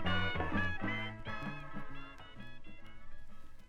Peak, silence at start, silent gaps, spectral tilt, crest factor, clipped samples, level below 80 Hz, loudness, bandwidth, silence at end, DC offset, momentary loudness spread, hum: -20 dBFS; 0 s; none; -6.5 dB/octave; 18 dB; under 0.1%; -48 dBFS; -39 LUFS; 6.2 kHz; 0 s; under 0.1%; 23 LU; none